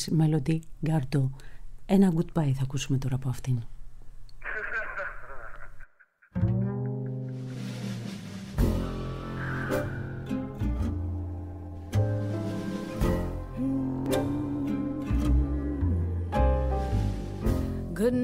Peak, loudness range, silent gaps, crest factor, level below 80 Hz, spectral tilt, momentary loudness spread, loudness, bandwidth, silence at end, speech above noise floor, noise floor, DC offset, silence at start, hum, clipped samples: -10 dBFS; 6 LU; none; 18 dB; -36 dBFS; -7.5 dB/octave; 11 LU; -30 LUFS; 16 kHz; 0 s; 34 dB; -60 dBFS; under 0.1%; 0 s; none; under 0.1%